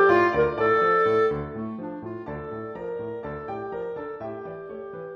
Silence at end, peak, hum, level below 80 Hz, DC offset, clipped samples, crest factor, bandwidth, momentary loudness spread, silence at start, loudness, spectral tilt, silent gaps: 0 s; -6 dBFS; none; -52 dBFS; under 0.1%; under 0.1%; 18 dB; 6.6 kHz; 16 LU; 0 s; -26 LUFS; -7.5 dB/octave; none